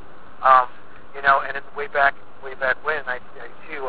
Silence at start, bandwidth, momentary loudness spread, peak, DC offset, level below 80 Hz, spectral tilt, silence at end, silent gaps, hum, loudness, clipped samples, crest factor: 0.25 s; 4 kHz; 24 LU; -2 dBFS; 3%; -56 dBFS; -6.5 dB/octave; 0 s; none; none; -21 LUFS; under 0.1%; 20 dB